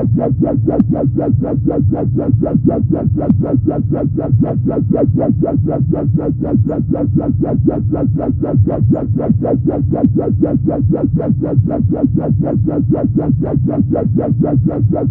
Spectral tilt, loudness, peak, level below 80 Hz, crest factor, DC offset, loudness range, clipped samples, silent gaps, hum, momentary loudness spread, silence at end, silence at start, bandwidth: -15 dB/octave; -14 LUFS; 0 dBFS; -32 dBFS; 12 dB; under 0.1%; 1 LU; under 0.1%; none; none; 2 LU; 0 s; 0 s; 2.5 kHz